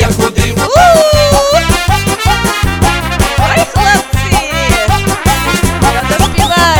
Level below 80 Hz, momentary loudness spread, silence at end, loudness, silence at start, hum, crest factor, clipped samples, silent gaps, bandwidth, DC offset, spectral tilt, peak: -18 dBFS; 5 LU; 0 s; -9 LUFS; 0 s; none; 10 dB; 0.5%; none; over 20 kHz; 0.2%; -4 dB/octave; 0 dBFS